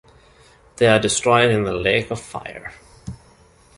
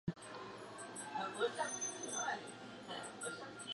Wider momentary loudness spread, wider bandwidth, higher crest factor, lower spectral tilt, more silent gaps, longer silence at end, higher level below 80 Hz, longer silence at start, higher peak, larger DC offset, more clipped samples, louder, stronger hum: first, 22 LU vs 11 LU; about the same, 11.5 kHz vs 11.5 kHz; about the same, 20 dB vs 18 dB; first, -4 dB/octave vs -2.5 dB/octave; neither; first, 0.6 s vs 0 s; first, -46 dBFS vs -76 dBFS; first, 0.8 s vs 0.05 s; first, -2 dBFS vs -26 dBFS; neither; neither; first, -18 LUFS vs -43 LUFS; neither